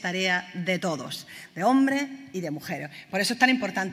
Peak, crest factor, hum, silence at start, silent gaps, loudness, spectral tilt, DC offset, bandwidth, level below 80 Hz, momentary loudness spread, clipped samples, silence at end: -6 dBFS; 22 dB; none; 0 s; none; -26 LUFS; -4 dB/octave; under 0.1%; 16 kHz; -74 dBFS; 13 LU; under 0.1%; 0 s